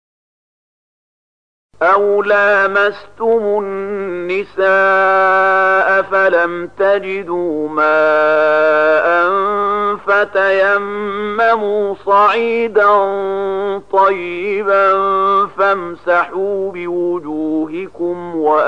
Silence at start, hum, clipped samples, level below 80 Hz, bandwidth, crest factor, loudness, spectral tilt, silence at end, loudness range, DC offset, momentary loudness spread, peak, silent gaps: 1.8 s; 50 Hz at -55 dBFS; under 0.1%; -58 dBFS; 8.2 kHz; 12 dB; -14 LUFS; -6 dB/octave; 0 s; 2 LU; 0.7%; 9 LU; -2 dBFS; none